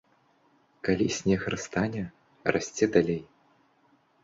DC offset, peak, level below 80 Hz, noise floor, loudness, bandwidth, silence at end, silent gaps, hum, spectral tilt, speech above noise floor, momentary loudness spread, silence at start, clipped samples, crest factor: under 0.1%; -6 dBFS; -56 dBFS; -66 dBFS; -28 LUFS; 7.8 kHz; 1 s; none; none; -5.5 dB/octave; 39 dB; 11 LU; 0.85 s; under 0.1%; 24 dB